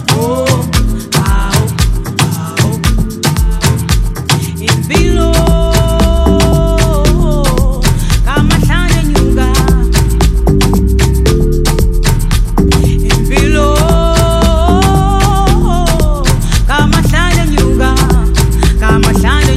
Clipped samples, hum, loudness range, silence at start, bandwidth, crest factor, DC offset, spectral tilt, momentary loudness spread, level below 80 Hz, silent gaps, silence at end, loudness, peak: under 0.1%; none; 3 LU; 0 s; 15.5 kHz; 8 dB; under 0.1%; -5.5 dB/octave; 4 LU; -12 dBFS; none; 0 s; -11 LUFS; 0 dBFS